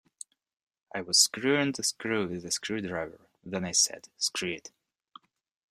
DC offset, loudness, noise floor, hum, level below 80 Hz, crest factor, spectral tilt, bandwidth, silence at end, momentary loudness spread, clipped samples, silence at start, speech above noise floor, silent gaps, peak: under 0.1%; -28 LUFS; -57 dBFS; none; -70 dBFS; 24 dB; -2 dB/octave; 16 kHz; 1 s; 18 LU; under 0.1%; 0.95 s; 27 dB; none; -8 dBFS